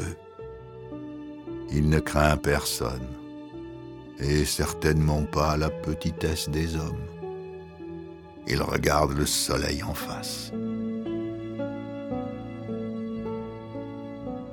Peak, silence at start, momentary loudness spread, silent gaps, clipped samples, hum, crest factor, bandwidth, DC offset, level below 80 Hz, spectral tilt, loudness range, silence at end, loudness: -4 dBFS; 0 s; 17 LU; none; under 0.1%; none; 24 dB; 19 kHz; under 0.1%; -38 dBFS; -5 dB/octave; 6 LU; 0 s; -28 LUFS